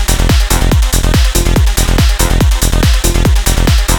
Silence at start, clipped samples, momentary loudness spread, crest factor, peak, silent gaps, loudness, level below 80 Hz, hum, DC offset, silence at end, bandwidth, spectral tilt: 0 s; under 0.1%; 0 LU; 8 dB; 0 dBFS; none; -11 LUFS; -10 dBFS; none; under 0.1%; 0 s; 20 kHz; -4 dB/octave